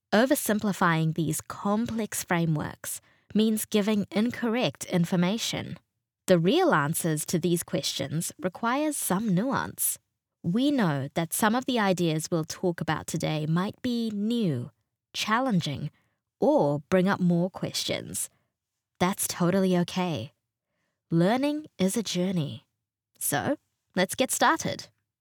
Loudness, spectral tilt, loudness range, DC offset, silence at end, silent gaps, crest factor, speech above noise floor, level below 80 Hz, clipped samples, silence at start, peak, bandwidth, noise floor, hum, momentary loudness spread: -27 LUFS; -5 dB/octave; 3 LU; under 0.1%; 0.35 s; none; 20 dB; 58 dB; -68 dBFS; under 0.1%; 0.1 s; -8 dBFS; over 20 kHz; -84 dBFS; none; 10 LU